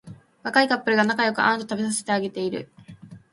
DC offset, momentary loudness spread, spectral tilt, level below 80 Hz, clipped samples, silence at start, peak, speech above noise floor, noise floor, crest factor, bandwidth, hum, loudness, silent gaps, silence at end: under 0.1%; 12 LU; -3.5 dB/octave; -66 dBFS; under 0.1%; 0.05 s; -4 dBFS; 22 dB; -45 dBFS; 22 dB; 11.5 kHz; none; -22 LUFS; none; 0.15 s